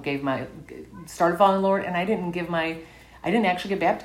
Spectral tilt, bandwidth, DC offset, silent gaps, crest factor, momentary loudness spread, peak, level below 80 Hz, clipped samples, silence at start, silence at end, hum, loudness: -6 dB/octave; 16 kHz; under 0.1%; none; 20 dB; 20 LU; -4 dBFS; -56 dBFS; under 0.1%; 0 s; 0 s; none; -24 LUFS